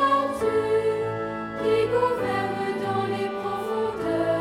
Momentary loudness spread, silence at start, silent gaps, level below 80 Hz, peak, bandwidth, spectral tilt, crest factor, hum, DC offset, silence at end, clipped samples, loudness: 6 LU; 0 s; none; -56 dBFS; -10 dBFS; 15 kHz; -6 dB/octave; 14 dB; none; under 0.1%; 0 s; under 0.1%; -25 LUFS